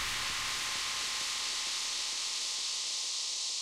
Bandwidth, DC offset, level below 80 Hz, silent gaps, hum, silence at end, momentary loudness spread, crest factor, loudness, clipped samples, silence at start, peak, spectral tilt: 16 kHz; under 0.1%; -62 dBFS; none; none; 0 s; 0 LU; 14 dB; -32 LUFS; under 0.1%; 0 s; -22 dBFS; 2 dB/octave